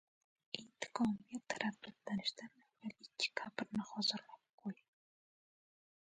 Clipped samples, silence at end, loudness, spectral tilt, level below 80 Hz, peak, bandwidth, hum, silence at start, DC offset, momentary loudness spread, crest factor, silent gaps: under 0.1%; 1.4 s; -42 LUFS; -3.5 dB/octave; -80 dBFS; -20 dBFS; 9.4 kHz; none; 0.55 s; under 0.1%; 14 LU; 24 dB; 4.53-4.58 s